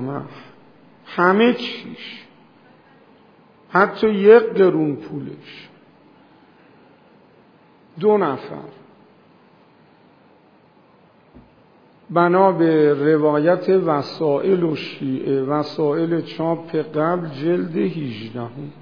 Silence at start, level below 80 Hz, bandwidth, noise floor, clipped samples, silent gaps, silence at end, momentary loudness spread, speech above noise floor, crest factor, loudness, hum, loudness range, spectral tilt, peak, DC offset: 0 s; -66 dBFS; 5.4 kHz; -53 dBFS; under 0.1%; none; 0 s; 17 LU; 34 dB; 20 dB; -18 LUFS; none; 8 LU; -8.5 dB/octave; 0 dBFS; under 0.1%